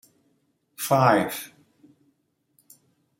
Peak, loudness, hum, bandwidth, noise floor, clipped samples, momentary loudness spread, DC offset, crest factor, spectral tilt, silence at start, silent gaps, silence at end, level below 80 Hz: -4 dBFS; -22 LUFS; none; 17 kHz; -70 dBFS; under 0.1%; 17 LU; under 0.1%; 24 dB; -5 dB/octave; 0.8 s; none; 1.75 s; -70 dBFS